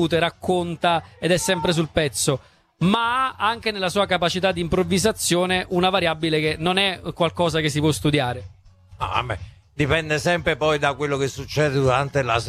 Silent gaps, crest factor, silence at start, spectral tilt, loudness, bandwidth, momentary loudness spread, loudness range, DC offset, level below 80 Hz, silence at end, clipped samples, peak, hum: none; 20 dB; 0 s; -4.5 dB/octave; -21 LUFS; 14 kHz; 5 LU; 3 LU; under 0.1%; -46 dBFS; 0 s; under 0.1%; -2 dBFS; none